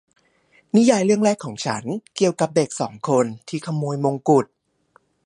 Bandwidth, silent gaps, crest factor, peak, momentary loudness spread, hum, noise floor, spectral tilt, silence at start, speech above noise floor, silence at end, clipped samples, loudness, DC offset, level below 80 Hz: 11.5 kHz; none; 18 dB; -4 dBFS; 11 LU; none; -60 dBFS; -5.5 dB/octave; 0.75 s; 40 dB; 0.8 s; under 0.1%; -21 LUFS; under 0.1%; -66 dBFS